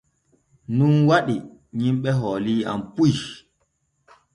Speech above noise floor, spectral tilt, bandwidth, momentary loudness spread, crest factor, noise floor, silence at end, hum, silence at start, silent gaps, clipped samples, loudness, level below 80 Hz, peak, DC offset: 50 dB; -7 dB/octave; 10.5 kHz; 11 LU; 16 dB; -70 dBFS; 1 s; none; 0.7 s; none; under 0.1%; -21 LUFS; -58 dBFS; -6 dBFS; under 0.1%